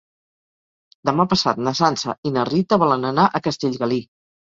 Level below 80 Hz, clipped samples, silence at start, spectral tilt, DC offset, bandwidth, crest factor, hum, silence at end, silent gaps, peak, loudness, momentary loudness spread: -56 dBFS; under 0.1%; 1.05 s; -5.5 dB/octave; under 0.1%; 7.8 kHz; 20 dB; none; 0.5 s; 2.18-2.23 s; -2 dBFS; -20 LUFS; 6 LU